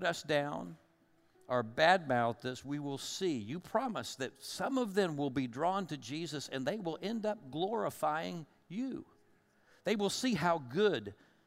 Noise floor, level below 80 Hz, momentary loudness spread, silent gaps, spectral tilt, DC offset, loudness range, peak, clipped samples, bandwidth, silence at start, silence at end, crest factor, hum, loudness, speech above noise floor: -70 dBFS; -74 dBFS; 10 LU; none; -4.5 dB/octave; under 0.1%; 4 LU; -14 dBFS; under 0.1%; 16 kHz; 0 s; 0.35 s; 22 dB; none; -35 LUFS; 35 dB